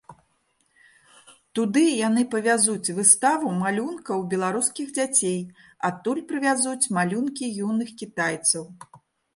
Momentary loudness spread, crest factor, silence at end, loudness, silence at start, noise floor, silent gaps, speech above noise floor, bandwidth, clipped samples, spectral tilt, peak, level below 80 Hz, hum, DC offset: 10 LU; 22 dB; 0.4 s; -23 LUFS; 0.1 s; -68 dBFS; none; 45 dB; 12 kHz; under 0.1%; -3.5 dB/octave; -2 dBFS; -72 dBFS; none; under 0.1%